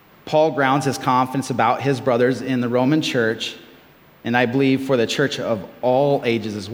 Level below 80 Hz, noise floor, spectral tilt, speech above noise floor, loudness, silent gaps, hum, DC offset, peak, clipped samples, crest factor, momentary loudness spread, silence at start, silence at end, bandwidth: -64 dBFS; -49 dBFS; -5.5 dB/octave; 30 dB; -19 LUFS; none; none; under 0.1%; -2 dBFS; under 0.1%; 18 dB; 7 LU; 0.25 s; 0 s; 17.5 kHz